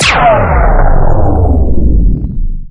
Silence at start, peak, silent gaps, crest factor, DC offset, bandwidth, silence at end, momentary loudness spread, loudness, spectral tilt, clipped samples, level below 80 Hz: 0 s; 0 dBFS; none; 6 dB; under 0.1%; 10.5 kHz; 0 s; 9 LU; -11 LUFS; -5.5 dB/octave; under 0.1%; -10 dBFS